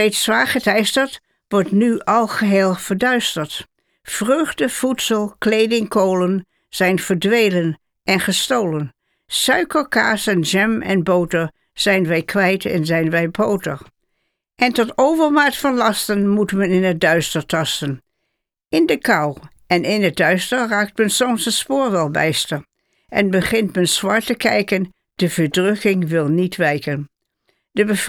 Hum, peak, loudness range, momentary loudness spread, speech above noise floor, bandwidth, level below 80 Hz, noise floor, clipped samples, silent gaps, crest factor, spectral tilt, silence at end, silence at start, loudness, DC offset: none; -2 dBFS; 2 LU; 8 LU; 58 dB; 19.5 kHz; -52 dBFS; -75 dBFS; under 0.1%; none; 16 dB; -4.5 dB/octave; 0 s; 0 s; -17 LUFS; under 0.1%